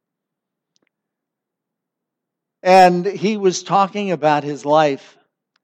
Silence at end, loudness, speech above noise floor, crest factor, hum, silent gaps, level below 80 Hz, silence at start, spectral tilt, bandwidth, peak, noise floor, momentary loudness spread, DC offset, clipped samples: 0.7 s; -16 LUFS; 67 dB; 18 dB; none; none; -70 dBFS; 2.65 s; -5 dB/octave; 12.5 kHz; 0 dBFS; -82 dBFS; 9 LU; under 0.1%; under 0.1%